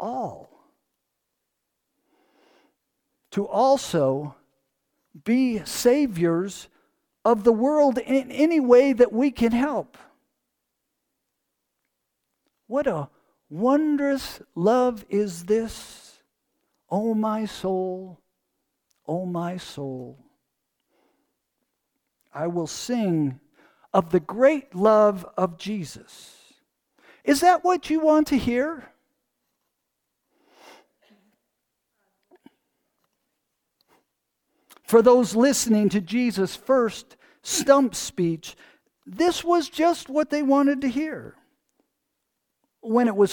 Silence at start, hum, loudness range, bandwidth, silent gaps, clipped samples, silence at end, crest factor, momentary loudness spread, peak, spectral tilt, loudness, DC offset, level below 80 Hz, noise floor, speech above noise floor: 0 s; none; 13 LU; 19 kHz; none; under 0.1%; 0 s; 22 dB; 16 LU; -2 dBFS; -5 dB/octave; -22 LUFS; under 0.1%; -58 dBFS; -80 dBFS; 58 dB